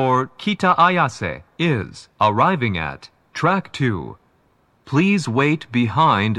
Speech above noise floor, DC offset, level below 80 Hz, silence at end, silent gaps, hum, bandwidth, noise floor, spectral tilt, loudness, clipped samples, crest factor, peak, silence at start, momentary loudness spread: 41 dB; under 0.1%; -52 dBFS; 0 s; none; none; 11 kHz; -60 dBFS; -6.5 dB/octave; -19 LUFS; under 0.1%; 16 dB; -2 dBFS; 0 s; 13 LU